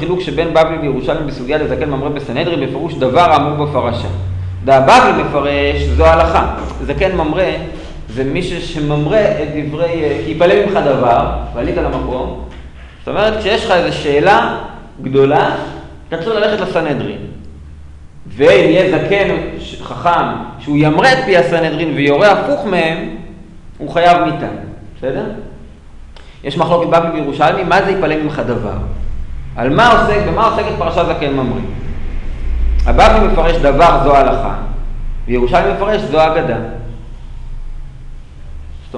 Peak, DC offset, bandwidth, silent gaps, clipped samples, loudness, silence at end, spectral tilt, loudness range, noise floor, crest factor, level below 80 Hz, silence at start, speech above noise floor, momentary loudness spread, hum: 0 dBFS; under 0.1%; 10.5 kHz; none; under 0.1%; -13 LUFS; 0 s; -6.5 dB/octave; 5 LU; -33 dBFS; 14 dB; -24 dBFS; 0 s; 21 dB; 18 LU; none